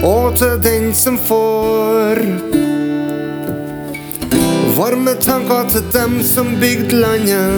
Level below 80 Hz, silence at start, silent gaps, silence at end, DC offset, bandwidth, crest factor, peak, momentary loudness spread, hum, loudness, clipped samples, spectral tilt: -32 dBFS; 0 s; none; 0 s; under 0.1%; over 20 kHz; 14 dB; 0 dBFS; 9 LU; none; -14 LUFS; under 0.1%; -4.5 dB/octave